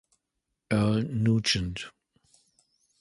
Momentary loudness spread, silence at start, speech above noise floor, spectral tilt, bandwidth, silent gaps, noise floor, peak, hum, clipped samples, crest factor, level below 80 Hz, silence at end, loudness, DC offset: 13 LU; 0.7 s; 57 dB; -5.5 dB/octave; 11.5 kHz; none; -83 dBFS; -10 dBFS; none; under 0.1%; 18 dB; -50 dBFS; 1.1 s; -27 LUFS; under 0.1%